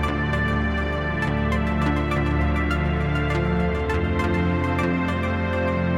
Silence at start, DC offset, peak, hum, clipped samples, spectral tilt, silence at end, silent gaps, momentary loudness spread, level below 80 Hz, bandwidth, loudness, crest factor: 0 s; 0.4%; -10 dBFS; none; under 0.1%; -7.5 dB/octave; 0 s; none; 2 LU; -30 dBFS; 10.5 kHz; -23 LUFS; 12 dB